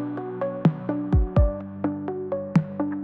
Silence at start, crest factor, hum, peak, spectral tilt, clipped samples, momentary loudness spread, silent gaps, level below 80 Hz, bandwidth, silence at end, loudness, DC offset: 0 s; 16 dB; none; -8 dBFS; -10.5 dB/octave; under 0.1%; 7 LU; none; -30 dBFS; 6.4 kHz; 0 s; -25 LUFS; under 0.1%